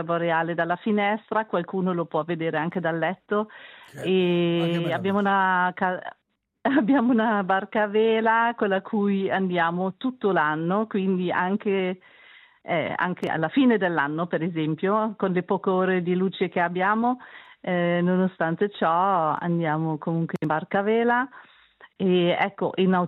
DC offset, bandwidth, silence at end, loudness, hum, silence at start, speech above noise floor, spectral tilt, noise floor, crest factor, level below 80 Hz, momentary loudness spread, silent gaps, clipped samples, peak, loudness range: under 0.1%; 4.6 kHz; 0 s; -24 LUFS; none; 0 s; 29 dB; -8.5 dB/octave; -52 dBFS; 16 dB; -74 dBFS; 7 LU; none; under 0.1%; -8 dBFS; 3 LU